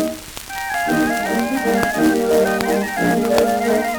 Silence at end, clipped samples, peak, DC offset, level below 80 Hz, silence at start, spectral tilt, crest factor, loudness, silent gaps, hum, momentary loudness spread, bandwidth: 0 s; under 0.1%; 0 dBFS; under 0.1%; -44 dBFS; 0 s; -4.5 dB/octave; 18 dB; -18 LUFS; none; none; 8 LU; over 20 kHz